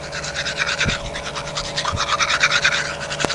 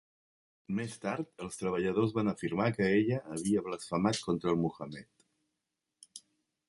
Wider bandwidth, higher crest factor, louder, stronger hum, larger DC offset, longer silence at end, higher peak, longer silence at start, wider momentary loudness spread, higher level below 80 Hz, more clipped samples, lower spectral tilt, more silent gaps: about the same, 11.5 kHz vs 11.5 kHz; about the same, 20 dB vs 20 dB; first, -20 LUFS vs -33 LUFS; neither; first, 0.2% vs under 0.1%; second, 0 s vs 0.5 s; first, 0 dBFS vs -14 dBFS; second, 0 s vs 0.7 s; second, 10 LU vs 16 LU; first, -40 dBFS vs -64 dBFS; neither; second, -2 dB/octave vs -6 dB/octave; neither